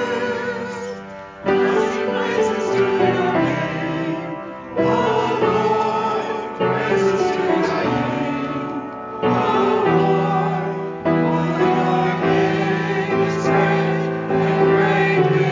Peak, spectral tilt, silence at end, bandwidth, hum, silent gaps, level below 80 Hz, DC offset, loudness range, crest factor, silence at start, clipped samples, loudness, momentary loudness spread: -4 dBFS; -7 dB/octave; 0 s; 7.6 kHz; none; none; -52 dBFS; under 0.1%; 2 LU; 14 dB; 0 s; under 0.1%; -19 LUFS; 9 LU